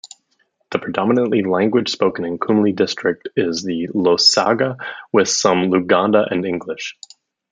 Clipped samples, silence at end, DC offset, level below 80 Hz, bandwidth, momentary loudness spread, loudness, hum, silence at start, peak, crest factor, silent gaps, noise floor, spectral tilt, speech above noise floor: under 0.1%; 0.6 s; under 0.1%; -62 dBFS; 9.6 kHz; 11 LU; -17 LUFS; none; 0.05 s; 0 dBFS; 18 dB; none; -65 dBFS; -4 dB/octave; 48 dB